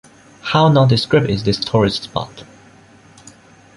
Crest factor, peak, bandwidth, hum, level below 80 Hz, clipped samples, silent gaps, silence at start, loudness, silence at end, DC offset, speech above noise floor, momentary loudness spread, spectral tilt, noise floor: 16 dB; -2 dBFS; 11.5 kHz; none; -44 dBFS; under 0.1%; none; 0.45 s; -16 LUFS; 1.3 s; under 0.1%; 31 dB; 14 LU; -6.5 dB/octave; -46 dBFS